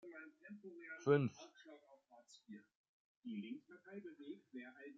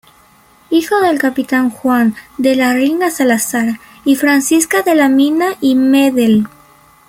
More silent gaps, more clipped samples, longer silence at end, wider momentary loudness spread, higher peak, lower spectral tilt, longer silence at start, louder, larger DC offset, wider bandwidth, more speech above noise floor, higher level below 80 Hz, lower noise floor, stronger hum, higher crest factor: first, 2.75-3.22 s vs none; neither; second, 0 s vs 0.6 s; first, 25 LU vs 6 LU; second, -22 dBFS vs 0 dBFS; first, -6.5 dB/octave vs -4 dB/octave; second, 0.05 s vs 0.7 s; second, -44 LUFS vs -13 LUFS; neither; second, 7.4 kHz vs 16.5 kHz; second, 25 dB vs 35 dB; second, -88 dBFS vs -54 dBFS; first, -68 dBFS vs -47 dBFS; neither; first, 24 dB vs 12 dB